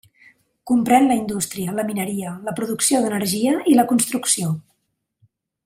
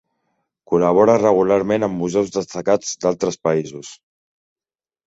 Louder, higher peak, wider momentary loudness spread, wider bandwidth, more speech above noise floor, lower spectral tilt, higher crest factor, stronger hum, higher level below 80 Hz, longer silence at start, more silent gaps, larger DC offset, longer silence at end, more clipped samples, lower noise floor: about the same, -19 LUFS vs -18 LUFS; about the same, -2 dBFS vs -2 dBFS; about the same, 10 LU vs 9 LU; first, 16 kHz vs 8 kHz; second, 54 dB vs over 72 dB; second, -4 dB/octave vs -5.5 dB/octave; about the same, 18 dB vs 18 dB; neither; second, -62 dBFS vs -56 dBFS; about the same, 0.65 s vs 0.7 s; neither; neither; about the same, 1.05 s vs 1.15 s; neither; second, -73 dBFS vs under -90 dBFS